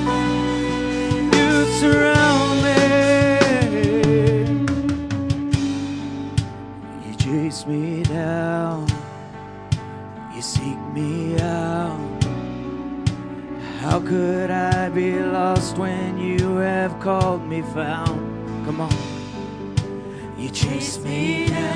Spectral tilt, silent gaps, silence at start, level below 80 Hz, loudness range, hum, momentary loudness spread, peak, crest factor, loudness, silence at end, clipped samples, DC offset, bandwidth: -6 dB/octave; none; 0 s; -40 dBFS; 9 LU; none; 15 LU; 0 dBFS; 20 dB; -21 LUFS; 0 s; under 0.1%; under 0.1%; 10.5 kHz